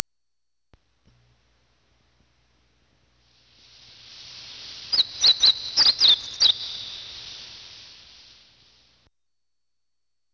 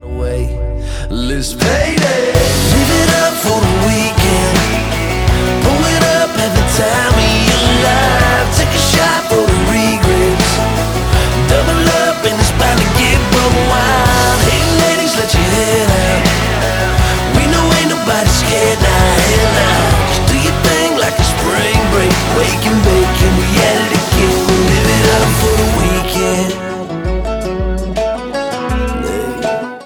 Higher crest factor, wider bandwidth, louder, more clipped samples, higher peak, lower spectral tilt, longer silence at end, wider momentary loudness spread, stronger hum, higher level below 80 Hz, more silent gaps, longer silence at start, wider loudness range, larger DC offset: first, 28 dB vs 12 dB; second, 8 kHz vs over 20 kHz; second, -18 LUFS vs -12 LUFS; neither; about the same, 0 dBFS vs 0 dBFS; second, 1.5 dB/octave vs -4.5 dB/octave; first, 2.8 s vs 0 s; first, 26 LU vs 8 LU; neither; second, -62 dBFS vs -20 dBFS; neither; first, 4.2 s vs 0.05 s; first, 13 LU vs 2 LU; neither